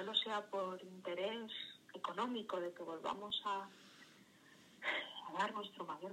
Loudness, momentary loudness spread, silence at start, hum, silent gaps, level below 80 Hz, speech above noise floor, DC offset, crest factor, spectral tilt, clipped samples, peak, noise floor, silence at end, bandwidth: -43 LUFS; 17 LU; 0 s; none; none; -88 dBFS; 21 dB; under 0.1%; 22 dB; -3.5 dB/octave; under 0.1%; -22 dBFS; -65 dBFS; 0 s; 16 kHz